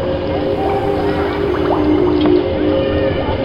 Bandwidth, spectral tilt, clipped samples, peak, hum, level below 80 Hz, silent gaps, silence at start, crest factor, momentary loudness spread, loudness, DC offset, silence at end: 6 kHz; -8.5 dB/octave; under 0.1%; -2 dBFS; none; -30 dBFS; none; 0 s; 14 dB; 4 LU; -16 LUFS; 0.3%; 0 s